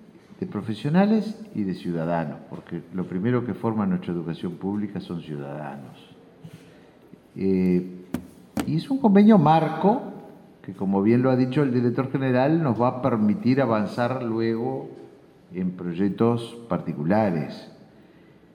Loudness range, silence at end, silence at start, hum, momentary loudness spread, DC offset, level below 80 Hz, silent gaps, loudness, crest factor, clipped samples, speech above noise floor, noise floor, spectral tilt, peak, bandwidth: 9 LU; 0.8 s; 0.3 s; none; 16 LU; under 0.1%; -62 dBFS; none; -24 LUFS; 18 dB; under 0.1%; 29 dB; -52 dBFS; -8.5 dB/octave; -6 dBFS; 13 kHz